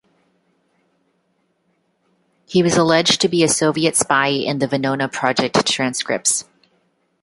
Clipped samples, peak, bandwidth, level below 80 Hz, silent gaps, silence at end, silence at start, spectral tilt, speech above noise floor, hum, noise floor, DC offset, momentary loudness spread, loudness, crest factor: under 0.1%; -2 dBFS; 12 kHz; -60 dBFS; none; 0.8 s; 2.5 s; -3 dB/octave; 49 dB; none; -66 dBFS; under 0.1%; 6 LU; -17 LUFS; 18 dB